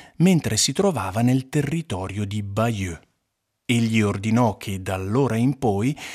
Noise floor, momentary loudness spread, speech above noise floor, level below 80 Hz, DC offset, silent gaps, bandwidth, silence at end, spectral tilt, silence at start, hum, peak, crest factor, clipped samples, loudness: -76 dBFS; 10 LU; 55 dB; -54 dBFS; under 0.1%; none; 15.5 kHz; 0 s; -5.5 dB/octave; 0 s; none; -6 dBFS; 16 dB; under 0.1%; -22 LUFS